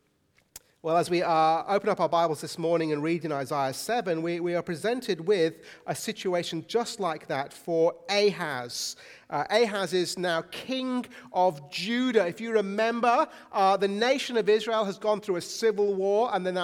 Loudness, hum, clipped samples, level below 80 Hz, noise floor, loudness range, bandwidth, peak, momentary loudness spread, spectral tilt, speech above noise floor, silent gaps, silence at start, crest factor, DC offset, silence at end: -27 LUFS; none; under 0.1%; -74 dBFS; -68 dBFS; 3 LU; 17 kHz; -10 dBFS; 8 LU; -4.5 dB/octave; 41 dB; none; 0.55 s; 18 dB; under 0.1%; 0 s